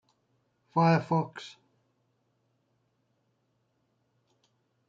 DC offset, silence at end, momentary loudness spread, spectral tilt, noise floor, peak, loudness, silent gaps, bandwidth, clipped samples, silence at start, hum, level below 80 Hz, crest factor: under 0.1%; 3.4 s; 21 LU; -8 dB/octave; -75 dBFS; -12 dBFS; -27 LUFS; none; 7.4 kHz; under 0.1%; 0.75 s; none; -80 dBFS; 22 dB